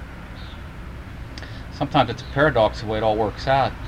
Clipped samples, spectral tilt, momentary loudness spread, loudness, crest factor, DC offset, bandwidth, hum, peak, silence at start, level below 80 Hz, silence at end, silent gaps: under 0.1%; -6.5 dB/octave; 18 LU; -21 LUFS; 20 dB; under 0.1%; 13.5 kHz; none; -4 dBFS; 0 s; -38 dBFS; 0 s; none